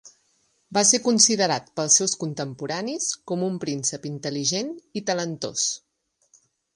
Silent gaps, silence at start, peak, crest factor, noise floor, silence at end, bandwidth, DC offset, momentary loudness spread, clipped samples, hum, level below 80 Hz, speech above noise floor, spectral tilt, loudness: none; 0.05 s; -2 dBFS; 22 dB; -67 dBFS; 1 s; 11.5 kHz; under 0.1%; 13 LU; under 0.1%; none; -70 dBFS; 43 dB; -2.5 dB/octave; -23 LUFS